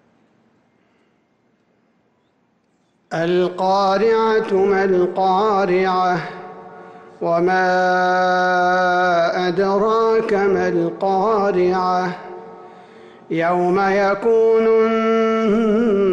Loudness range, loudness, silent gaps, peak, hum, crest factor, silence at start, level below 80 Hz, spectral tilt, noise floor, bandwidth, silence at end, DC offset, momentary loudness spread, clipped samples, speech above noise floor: 4 LU; -17 LUFS; none; -8 dBFS; none; 10 dB; 3.1 s; -56 dBFS; -6.5 dB/octave; -62 dBFS; 7.8 kHz; 0 s; under 0.1%; 8 LU; under 0.1%; 46 dB